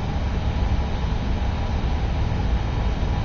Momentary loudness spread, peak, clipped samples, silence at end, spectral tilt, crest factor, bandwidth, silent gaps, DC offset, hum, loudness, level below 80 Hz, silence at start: 1 LU; -10 dBFS; under 0.1%; 0 s; -7 dB/octave; 12 dB; 7 kHz; none; under 0.1%; none; -25 LUFS; -24 dBFS; 0 s